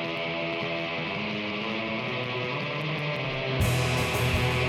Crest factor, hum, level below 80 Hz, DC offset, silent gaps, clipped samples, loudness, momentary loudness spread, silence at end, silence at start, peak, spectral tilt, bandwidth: 14 dB; none; -44 dBFS; under 0.1%; none; under 0.1%; -28 LUFS; 5 LU; 0 s; 0 s; -14 dBFS; -5 dB/octave; 16.5 kHz